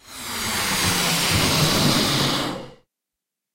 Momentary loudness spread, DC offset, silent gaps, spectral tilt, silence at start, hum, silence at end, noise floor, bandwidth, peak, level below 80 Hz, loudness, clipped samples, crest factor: 10 LU; under 0.1%; none; -3 dB/octave; 0.05 s; none; 0.8 s; -85 dBFS; 16 kHz; -6 dBFS; -42 dBFS; -20 LUFS; under 0.1%; 16 dB